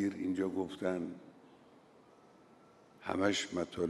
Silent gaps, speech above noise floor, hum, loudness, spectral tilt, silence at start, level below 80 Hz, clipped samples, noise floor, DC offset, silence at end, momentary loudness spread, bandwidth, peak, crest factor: none; 26 dB; none; -36 LUFS; -4.5 dB/octave; 0 s; -74 dBFS; under 0.1%; -62 dBFS; under 0.1%; 0 s; 13 LU; 12 kHz; -18 dBFS; 20 dB